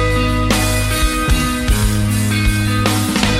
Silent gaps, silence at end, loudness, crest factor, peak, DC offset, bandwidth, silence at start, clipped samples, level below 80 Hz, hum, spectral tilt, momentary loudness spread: none; 0 s; -16 LUFS; 14 dB; 0 dBFS; under 0.1%; 16.5 kHz; 0 s; under 0.1%; -20 dBFS; none; -4.5 dB/octave; 1 LU